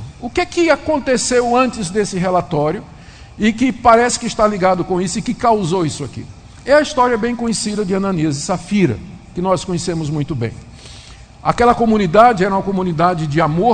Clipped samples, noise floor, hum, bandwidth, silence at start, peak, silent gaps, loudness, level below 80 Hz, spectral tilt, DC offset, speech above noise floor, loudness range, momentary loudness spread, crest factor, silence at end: under 0.1%; -38 dBFS; none; 9.4 kHz; 0 s; 0 dBFS; none; -16 LUFS; -40 dBFS; -5 dB/octave; under 0.1%; 23 dB; 4 LU; 12 LU; 16 dB; 0 s